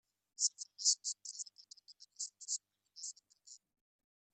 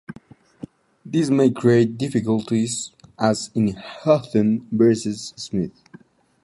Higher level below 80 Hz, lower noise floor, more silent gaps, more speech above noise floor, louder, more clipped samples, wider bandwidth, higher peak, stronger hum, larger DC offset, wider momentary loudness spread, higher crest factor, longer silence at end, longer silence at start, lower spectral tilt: second, under -90 dBFS vs -56 dBFS; first, -62 dBFS vs -49 dBFS; neither; second, 24 dB vs 29 dB; second, -38 LUFS vs -21 LUFS; neither; about the same, 12 kHz vs 11.5 kHz; second, -18 dBFS vs -2 dBFS; neither; neither; first, 26 LU vs 17 LU; first, 26 dB vs 18 dB; about the same, 0.75 s vs 0.75 s; first, 0.4 s vs 0.1 s; second, 7 dB/octave vs -6 dB/octave